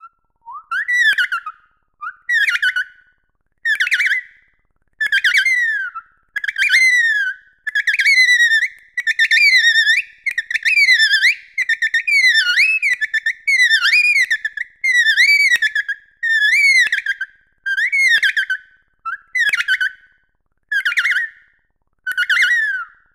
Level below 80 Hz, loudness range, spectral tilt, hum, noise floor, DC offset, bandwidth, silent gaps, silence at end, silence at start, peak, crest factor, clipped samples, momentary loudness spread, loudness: -66 dBFS; 6 LU; 5 dB/octave; none; -65 dBFS; under 0.1%; 16 kHz; none; 0.3 s; 0.05 s; -2 dBFS; 16 dB; under 0.1%; 14 LU; -14 LUFS